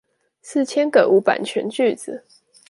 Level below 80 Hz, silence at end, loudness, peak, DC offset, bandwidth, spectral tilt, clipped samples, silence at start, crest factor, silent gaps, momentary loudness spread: -72 dBFS; 0.5 s; -19 LUFS; -2 dBFS; under 0.1%; 11.5 kHz; -4.5 dB/octave; under 0.1%; 0.45 s; 18 dB; none; 16 LU